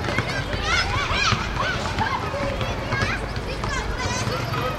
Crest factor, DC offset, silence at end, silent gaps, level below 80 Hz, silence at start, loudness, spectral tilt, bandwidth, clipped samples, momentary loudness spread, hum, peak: 22 dB; under 0.1%; 0 s; none; -34 dBFS; 0 s; -24 LUFS; -4 dB/octave; 15.5 kHz; under 0.1%; 6 LU; none; -4 dBFS